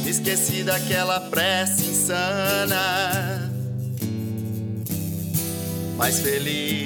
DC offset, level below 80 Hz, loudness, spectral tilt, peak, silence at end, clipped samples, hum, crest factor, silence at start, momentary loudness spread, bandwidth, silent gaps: under 0.1%; -58 dBFS; -23 LUFS; -3.5 dB/octave; -6 dBFS; 0 s; under 0.1%; none; 18 dB; 0 s; 8 LU; 19.5 kHz; none